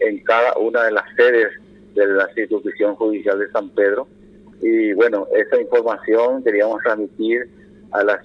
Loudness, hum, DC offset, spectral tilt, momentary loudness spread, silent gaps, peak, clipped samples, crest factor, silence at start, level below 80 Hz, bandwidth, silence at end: -18 LUFS; none; under 0.1%; -6 dB/octave; 7 LU; none; -2 dBFS; under 0.1%; 16 dB; 0 s; -64 dBFS; 6 kHz; 0.05 s